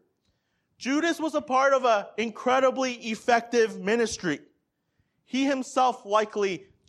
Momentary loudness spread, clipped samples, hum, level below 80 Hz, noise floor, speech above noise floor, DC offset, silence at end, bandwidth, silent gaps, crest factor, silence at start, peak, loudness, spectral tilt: 8 LU; under 0.1%; none; -66 dBFS; -74 dBFS; 49 dB; under 0.1%; 0.25 s; 13 kHz; none; 18 dB; 0.8 s; -8 dBFS; -26 LUFS; -3.5 dB/octave